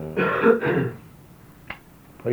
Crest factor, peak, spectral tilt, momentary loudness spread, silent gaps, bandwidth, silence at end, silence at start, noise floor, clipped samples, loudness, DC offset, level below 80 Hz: 20 dB; -4 dBFS; -8 dB/octave; 21 LU; none; over 20 kHz; 0 s; 0 s; -48 dBFS; under 0.1%; -22 LUFS; under 0.1%; -56 dBFS